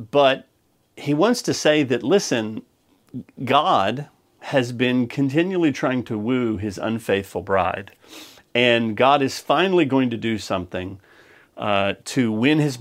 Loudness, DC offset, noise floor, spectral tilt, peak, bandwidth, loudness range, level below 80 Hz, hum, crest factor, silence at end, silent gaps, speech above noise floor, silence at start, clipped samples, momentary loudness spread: -21 LUFS; under 0.1%; -56 dBFS; -5 dB/octave; -2 dBFS; 16 kHz; 2 LU; -60 dBFS; none; 20 dB; 0 s; none; 36 dB; 0 s; under 0.1%; 15 LU